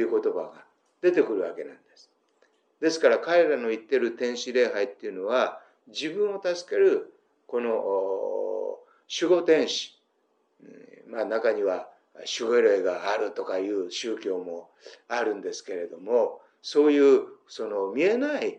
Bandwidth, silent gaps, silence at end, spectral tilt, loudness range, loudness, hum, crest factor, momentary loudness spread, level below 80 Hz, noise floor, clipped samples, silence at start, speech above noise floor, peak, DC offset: 9.2 kHz; none; 0 s; -3.5 dB/octave; 3 LU; -26 LUFS; none; 20 dB; 14 LU; under -90 dBFS; -71 dBFS; under 0.1%; 0 s; 45 dB; -6 dBFS; under 0.1%